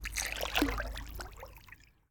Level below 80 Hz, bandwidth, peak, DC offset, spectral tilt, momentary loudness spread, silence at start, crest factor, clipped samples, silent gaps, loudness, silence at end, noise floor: -44 dBFS; 19.5 kHz; -12 dBFS; under 0.1%; -3 dB/octave; 21 LU; 0 s; 26 dB; under 0.1%; none; -35 LUFS; 0.25 s; -57 dBFS